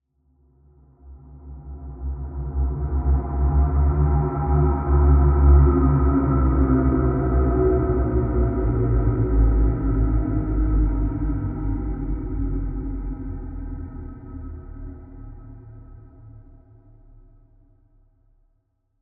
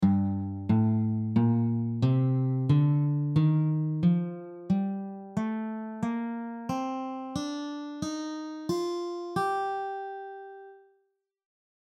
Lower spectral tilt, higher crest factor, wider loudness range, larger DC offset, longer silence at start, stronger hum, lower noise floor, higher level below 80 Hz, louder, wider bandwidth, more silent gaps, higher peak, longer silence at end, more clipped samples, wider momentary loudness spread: first, -13 dB/octave vs -8 dB/octave; about the same, 16 dB vs 16 dB; first, 18 LU vs 8 LU; neither; first, 1.05 s vs 0 s; neither; second, -68 dBFS vs -75 dBFS; first, -24 dBFS vs -62 dBFS; first, -22 LUFS vs -29 LUFS; second, 2.4 kHz vs 10 kHz; neither; first, -6 dBFS vs -12 dBFS; first, 2.6 s vs 1.2 s; neither; first, 20 LU vs 12 LU